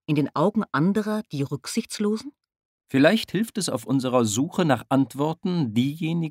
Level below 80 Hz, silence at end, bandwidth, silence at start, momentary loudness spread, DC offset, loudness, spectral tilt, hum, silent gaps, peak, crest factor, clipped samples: -66 dBFS; 0 s; 16 kHz; 0.1 s; 8 LU; under 0.1%; -24 LUFS; -5.5 dB/octave; none; 2.65-2.78 s; -4 dBFS; 20 dB; under 0.1%